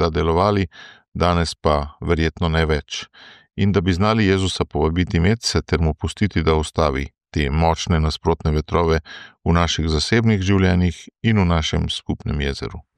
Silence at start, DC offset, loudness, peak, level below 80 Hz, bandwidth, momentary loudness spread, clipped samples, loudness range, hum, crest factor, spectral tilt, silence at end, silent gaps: 0 s; under 0.1%; -20 LUFS; -4 dBFS; -30 dBFS; 10.5 kHz; 8 LU; under 0.1%; 2 LU; none; 16 dB; -6 dB/octave; 0.15 s; 1.08-1.12 s